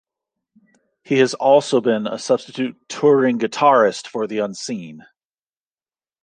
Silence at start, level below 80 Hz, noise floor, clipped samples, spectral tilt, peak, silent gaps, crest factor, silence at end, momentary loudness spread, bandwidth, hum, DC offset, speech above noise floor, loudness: 1.1 s; -72 dBFS; under -90 dBFS; under 0.1%; -5 dB/octave; -2 dBFS; none; 18 dB; 1.2 s; 12 LU; 9.8 kHz; none; under 0.1%; over 72 dB; -18 LUFS